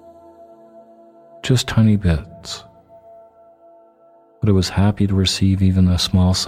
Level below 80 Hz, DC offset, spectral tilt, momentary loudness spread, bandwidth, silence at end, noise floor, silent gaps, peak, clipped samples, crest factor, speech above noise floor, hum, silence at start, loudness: -36 dBFS; under 0.1%; -5.5 dB/octave; 15 LU; 14.5 kHz; 0 s; -51 dBFS; none; -2 dBFS; under 0.1%; 16 dB; 35 dB; none; 1.45 s; -17 LUFS